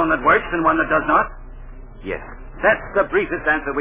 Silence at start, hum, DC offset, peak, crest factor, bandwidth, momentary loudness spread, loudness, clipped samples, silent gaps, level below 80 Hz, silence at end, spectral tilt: 0 s; none; under 0.1%; -4 dBFS; 16 dB; 3.7 kHz; 14 LU; -18 LUFS; under 0.1%; none; -38 dBFS; 0 s; -9 dB/octave